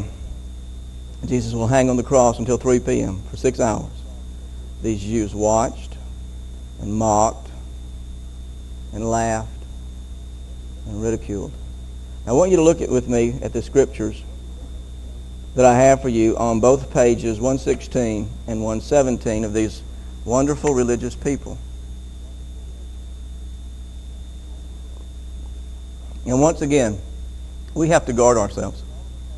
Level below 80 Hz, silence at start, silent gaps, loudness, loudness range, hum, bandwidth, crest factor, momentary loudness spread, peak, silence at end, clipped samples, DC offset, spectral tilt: -32 dBFS; 0 s; none; -19 LUFS; 11 LU; none; 12 kHz; 20 dB; 20 LU; 0 dBFS; 0 s; under 0.1%; under 0.1%; -6 dB/octave